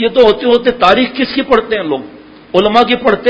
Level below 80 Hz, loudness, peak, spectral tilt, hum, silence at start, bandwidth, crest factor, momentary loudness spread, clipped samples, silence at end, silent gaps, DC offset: -42 dBFS; -11 LUFS; 0 dBFS; -6 dB/octave; none; 0 s; 8 kHz; 12 dB; 7 LU; 0.6%; 0 s; none; under 0.1%